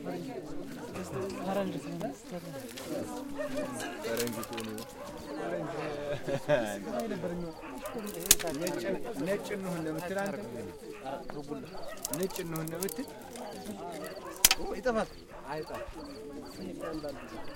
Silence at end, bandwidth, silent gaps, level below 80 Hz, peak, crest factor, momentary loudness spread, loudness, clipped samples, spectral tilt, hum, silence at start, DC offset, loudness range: 0 s; 17 kHz; none; -54 dBFS; 0 dBFS; 34 dB; 13 LU; -35 LUFS; under 0.1%; -3 dB/octave; none; 0 s; under 0.1%; 7 LU